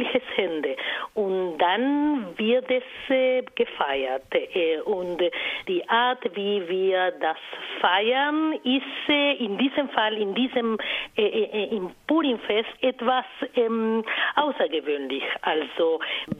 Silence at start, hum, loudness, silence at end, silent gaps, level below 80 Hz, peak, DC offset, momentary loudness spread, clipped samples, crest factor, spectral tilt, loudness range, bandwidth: 0 s; none; -25 LUFS; 0 s; none; -66 dBFS; -4 dBFS; under 0.1%; 6 LU; under 0.1%; 20 dB; -6 dB/octave; 2 LU; 6.4 kHz